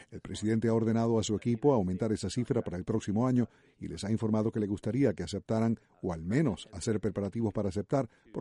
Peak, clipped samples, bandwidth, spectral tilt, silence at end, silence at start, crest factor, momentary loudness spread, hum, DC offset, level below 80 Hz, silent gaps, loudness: -14 dBFS; under 0.1%; 11.5 kHz; -7 dB/octave; 0 s; 0 s; 18 dB; 9 LU; none; under 0.1%; -58 dBFS; none; -31 LUFS